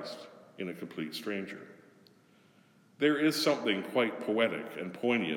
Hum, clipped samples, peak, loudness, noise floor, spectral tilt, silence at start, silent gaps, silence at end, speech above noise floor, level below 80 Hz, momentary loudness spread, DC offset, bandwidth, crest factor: none; under 0.1%; -12 dBFS; -32 LUFS; -63 dBFS; -4.5 dB/octave; 0 s; none; 0 s; 32 dB; -88 dBFS; 16 LU; under 0.1%; 17.5 kHz; 20 dB